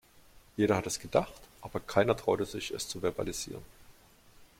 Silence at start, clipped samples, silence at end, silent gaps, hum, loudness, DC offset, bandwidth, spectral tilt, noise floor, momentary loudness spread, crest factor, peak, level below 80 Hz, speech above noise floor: 0.55 s; under 0.1%; 0.15 s; none; none; -32 LUFS; under 0.1%; 16.5 kHz; -4.5 dB/octave; -59 dBFS; 14 LU; 24 dB; -10 dBFS; -56 dBFS; 27 dB